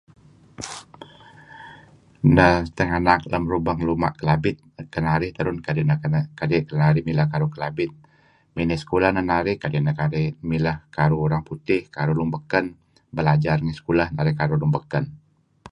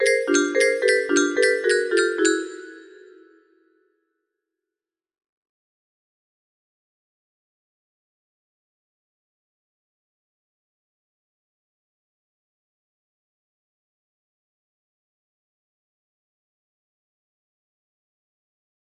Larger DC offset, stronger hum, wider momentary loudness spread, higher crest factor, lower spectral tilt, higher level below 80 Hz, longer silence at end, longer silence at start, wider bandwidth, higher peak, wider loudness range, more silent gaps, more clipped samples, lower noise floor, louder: neither; neither; first, 11 LU vs 6 LU; about the same, 22 dB vs 22 dB; first, -7.5 dB/octave vs -0.5 dB/octave; first, -42 dBFS vs -78 dBFS; second, 0.55 s vs 16.2 s; first, 0.6 s vs 0 s; second, 10 kHz vs 12 kHz; first, 0 dBFS vs -6 dBFS; second, 3 LU vs 10 LU; neither; neither; second, -55 dBFS vs -90 dBFS; about the same, -22 LUFS vs -20 LUFS